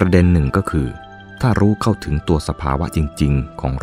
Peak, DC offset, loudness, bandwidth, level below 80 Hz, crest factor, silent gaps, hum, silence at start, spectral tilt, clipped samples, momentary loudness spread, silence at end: 0 dBFS; under 0.1%; -18 LUFS; 15 kHz; -28 dBFS; 16 dB; none; none; 0 s; -7.5 dB/octave; under 0.1%; 9 LU; 0 s